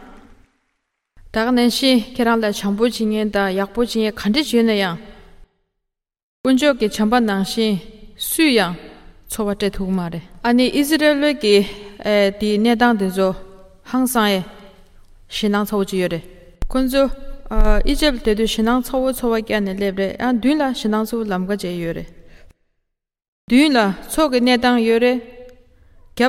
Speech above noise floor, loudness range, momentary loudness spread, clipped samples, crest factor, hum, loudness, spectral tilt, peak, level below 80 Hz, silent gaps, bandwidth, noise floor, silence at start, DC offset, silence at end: 61 dB; 4 LU; 10 LU; under 0.1%; 18 dB; none; -18 LUFS; -4.5 dB/octave; 0 dBFS; -30 dBFS; 6.23-6.44 s, 23.28-23.48 s; 16.5 kHz; -78 dBFS; 0 s; under 0.1%; 0 s